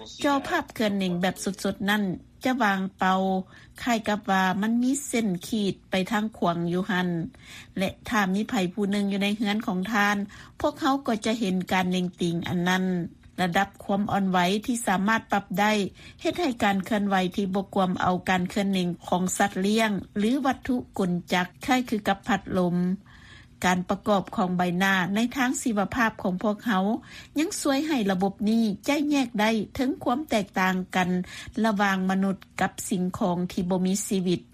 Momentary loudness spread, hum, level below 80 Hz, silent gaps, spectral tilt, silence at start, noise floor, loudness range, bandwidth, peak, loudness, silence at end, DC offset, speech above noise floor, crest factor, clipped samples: 5 LU; none; -56 dBFS; none; -5 dB/octave; 0 s; -49 dBFS; 2 LU; 15.5 kHz; -8 dBFS; -26 LUFS; 0.1 s; under 0.1%; 24 dB; 18 dB; under 0.1%